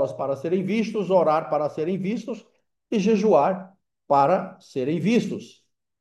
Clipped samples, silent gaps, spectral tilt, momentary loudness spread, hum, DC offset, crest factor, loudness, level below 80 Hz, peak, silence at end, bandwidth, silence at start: under 0.1%; none; -7 dB/octave; 13 LU; none; under 0.1%; 16 dB; -23 LUFS; -72 dBFS; -6 dBFS; 0.55 s; 11.5 kHz; 0 s